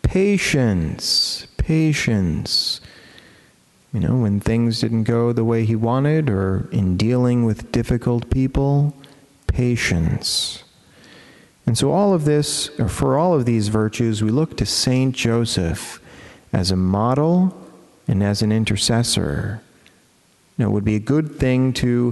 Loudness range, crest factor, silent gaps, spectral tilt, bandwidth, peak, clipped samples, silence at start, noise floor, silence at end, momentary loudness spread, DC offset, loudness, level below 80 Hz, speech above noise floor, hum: 2 LU; 16 dB; none; -5.5 dB/octave; 12 kHz; -2 dBFS; under 0.1%; 0.05 s; -57 dBFS; 0 s; 7 LU; under 0.1%; -19 LUFS; -36 dBFS; 38 dB; none